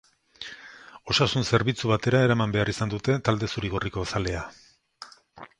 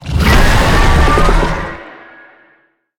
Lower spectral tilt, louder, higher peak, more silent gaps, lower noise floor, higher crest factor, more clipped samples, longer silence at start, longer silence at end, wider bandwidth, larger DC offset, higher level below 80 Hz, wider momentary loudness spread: about the same, -5.5 dB/octave vs -5 dB/octave; second, -25 LUFS vs -12 LUFS; second, -6 dBFS vs 0 dBFS; neither; second, -49 dBFS vs -54 dBFS; first, 20 dB vs 12 dB; neither; first, 0.4 s vs 0.05 s; second, 0.15 s vs 1.1 s; second, 11 kHz vs 17.5 kHz; neither; second, -48 dBFS vs -14 dBFS; first, 23 LU vs 13 LU